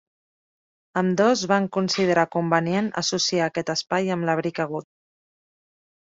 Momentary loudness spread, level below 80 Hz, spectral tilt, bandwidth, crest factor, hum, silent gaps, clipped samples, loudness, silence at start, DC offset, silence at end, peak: 7 LU; -66 dBFS; -4.5 dB/octave; 7.8 kHz; 20 dB; none; none; under 0.1%; -23 LUFS; 0.95 s; under 0.1%; 1.25 s; -4 dBFS